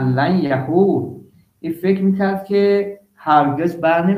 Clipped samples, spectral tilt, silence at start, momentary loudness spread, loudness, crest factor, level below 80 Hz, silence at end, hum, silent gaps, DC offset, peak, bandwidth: under 0.1%; -9 dB/octave; 0 s; 13 LU; -17 LUFS; 16 dB; -60 dBFS; 0 s; none; none; under 0.1%; -2 dBFS; 15 kHz